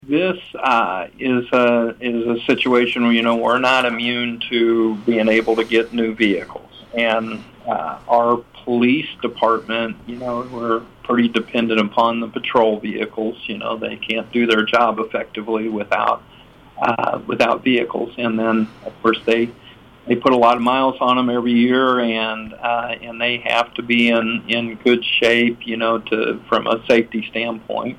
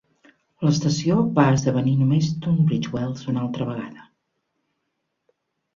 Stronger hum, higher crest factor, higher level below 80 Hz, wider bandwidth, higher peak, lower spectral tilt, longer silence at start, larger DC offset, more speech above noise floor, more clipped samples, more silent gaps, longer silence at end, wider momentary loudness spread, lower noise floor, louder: neither; about the same, 16 dB vs 18 dB; about the same, -54 dBFS vs -56 dBFS; first, 10.5 kHz vs 7.6 kHz; about the same, -2 dBFS vs -4 dBFS; second, -5.5 dB/octave vs -7 dB/octave; second, 0.05 s vs 0.6 s; neither; second, 24 dB vs 56 dB; neither; neither; second, 0 s vs 1.75 s; about the same, 9 LU vs 10 LU; second, -42 dBFS vs -76 dBFS; first, -18 LUFS vs -21 LUFS